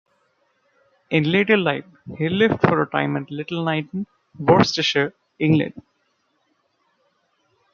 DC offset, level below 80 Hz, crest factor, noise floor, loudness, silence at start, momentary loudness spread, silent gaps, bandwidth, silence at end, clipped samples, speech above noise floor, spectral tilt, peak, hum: under 0.1%; -60 dBFS; 20 dB; -68 dBFS; -20 LUFS; 1.1 s; 13 LU; none; 7.2 kHz; 1.95 s; under 0.1%; 48 dB; -6 dB/octave; -2 dBFS; none